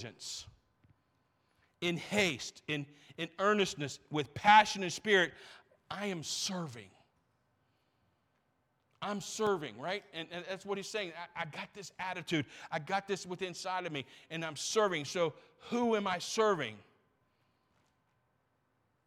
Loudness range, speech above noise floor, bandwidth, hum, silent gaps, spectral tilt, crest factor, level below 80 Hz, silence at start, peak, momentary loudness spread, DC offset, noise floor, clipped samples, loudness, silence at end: 11 LU; 43 dB; 16 kHz; none; none; -3.5 dB/octave; 26 dB; -74 dBFS; 0 s; -10 dBFS; 14 LU; under 0.1%; -78 dBFS; under 0.1%; -34 LUFS; 2.25 s